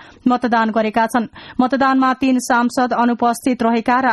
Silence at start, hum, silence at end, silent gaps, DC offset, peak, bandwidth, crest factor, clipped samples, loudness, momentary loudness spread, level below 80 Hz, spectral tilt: 0 s; none; 0 s; none; under 0.1%; -2 dBFS; 12.5 kHz; 14 dB; under 0.1%; -17 LUFS; 4 LU; -52 dBFS; -4.5 dB/octave